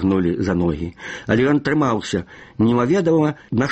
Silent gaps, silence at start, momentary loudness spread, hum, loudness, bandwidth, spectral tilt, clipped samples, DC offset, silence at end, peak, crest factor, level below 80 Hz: none; 0 s; 11 LU; none; -19 LUFS; 8.4 kHz; -7 dB/octave; under 0.1%; under 0.1%; 0 s; -2 dBFS; 16 dB; -44 dBFS